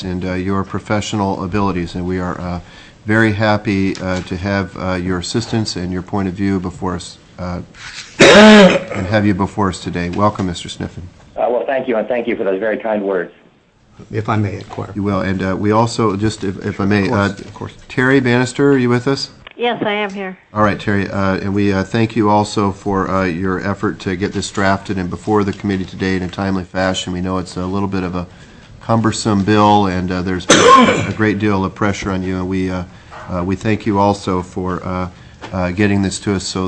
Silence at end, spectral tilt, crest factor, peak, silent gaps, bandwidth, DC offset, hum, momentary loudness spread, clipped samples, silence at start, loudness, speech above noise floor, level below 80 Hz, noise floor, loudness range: 0 s; -5.5 dB/octave; 16 dB; 0 dBFS; none; 10.5 kHz; under 0.1%; none; 14 LU; under 0.1%; 0 s; -16 LUFS; 35 dB; -42 dBFS; -50 dBFS; 9 LU